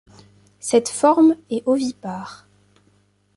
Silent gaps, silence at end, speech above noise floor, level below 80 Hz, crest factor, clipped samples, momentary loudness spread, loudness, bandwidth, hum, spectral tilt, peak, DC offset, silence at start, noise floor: none; 1 s; 42 dB; -64 dBFS; 18 dB; under 0.1%; 17 LU; -18 LUFS; 11.5 kHz; 50 Hz at -55 dBFS; -4.5 dB/octave; -4 dBFS; under 0.1%; 0.65 s; -60 dBFS